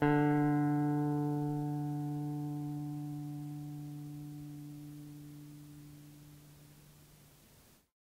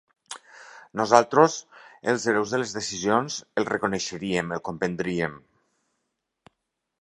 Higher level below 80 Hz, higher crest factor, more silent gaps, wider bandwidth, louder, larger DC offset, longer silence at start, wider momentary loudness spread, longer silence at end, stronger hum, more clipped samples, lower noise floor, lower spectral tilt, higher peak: second, -70 dBFS vs -62 dBFS; second, 18 dB vs 26 dB; neither; first, 16 kHz vs 11.5 kHz; second, -36 LUFS vs -25 LUFS; neither; second, 0 s vs 0.3 s; first, 24 LU vs 16 LU; second, 0.85 s vs 1.65 s; neither; neither; second, -63 dBFS vs -80 dBFS; first, -8.5 dB/octave vs -4 dB/octave; second, -18 dBFS vs 0 dBFS